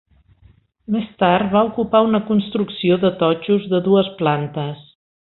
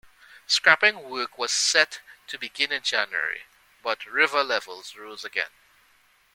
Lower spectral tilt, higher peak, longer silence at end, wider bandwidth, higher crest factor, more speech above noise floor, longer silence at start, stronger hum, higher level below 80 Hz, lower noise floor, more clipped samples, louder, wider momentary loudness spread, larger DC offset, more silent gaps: first, -12 dB/octave vs 0.5 dB/octave; about the same, -2 dBFS vs -2 dBFS; second, 0.5 s vs 0.9 s; second, 4.2 kHz vs 17 kHz; second, 18 dB vs 26 dB; about the same, 35 dB vs 36 dB; first, 0.9 s vs 0.5 s; neither; first, -54 dBFS vs -72 dBFS; second, -53 dBFS vs -62 dBFS; neither; first, -18 LUFS vs -23 LUFS; second, 8 LU vs 18 LU; neither; neither